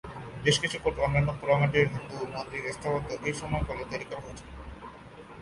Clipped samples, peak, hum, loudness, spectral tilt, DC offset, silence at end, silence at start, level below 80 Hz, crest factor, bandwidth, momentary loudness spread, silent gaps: under 0.1%; -10 dBFS; none; -29 LUFS; -5 dB/octave; under 0.1%; 0 s; 0.05 s; -46 dBFS; 20 dB; 11.5 kHz; 19 LU; none